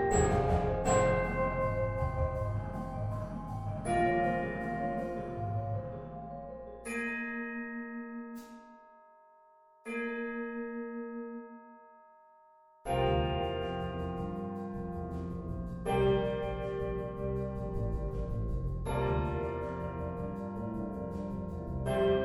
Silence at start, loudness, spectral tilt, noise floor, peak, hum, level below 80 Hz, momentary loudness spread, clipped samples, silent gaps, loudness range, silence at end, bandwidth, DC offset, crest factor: 0 s; -35 LUFS; -6.5 dB/octave; -62 dBFS; -14 dBFS; none; -44 dBFS; 13 LU; under 0.1%; none; 8 LU; 0 s; 13.5 kHz; under 0.1%; 20 dB